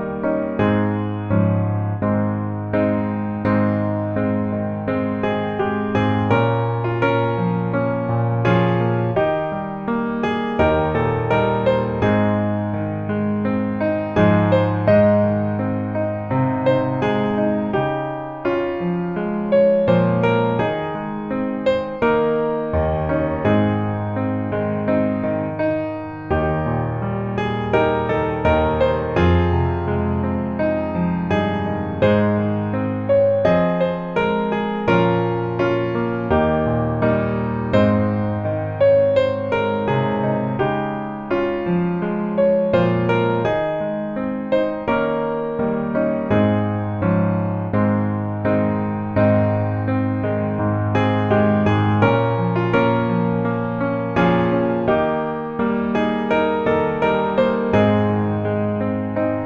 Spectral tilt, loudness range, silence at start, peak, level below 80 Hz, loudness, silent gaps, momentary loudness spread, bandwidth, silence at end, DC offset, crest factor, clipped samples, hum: -9.5 dB/octave; 3 LU; 0 s; -2 dBFS; -40 dBFS; -20 LUFS; none; 6 LU; 6.6 kHz; 0 s; under 0.1%; 16 dB; under 0.1%; none